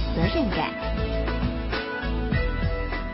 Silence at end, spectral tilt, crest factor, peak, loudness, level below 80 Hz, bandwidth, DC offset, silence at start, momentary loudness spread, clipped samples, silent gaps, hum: 0 s; -10.5 dB/octave; 18 dB; -8 dBFS; -27 LUFS; -30 dBFS; 5.8 kHz; under 0.1%; 0 s; 5 LU; under 0.1%; none; none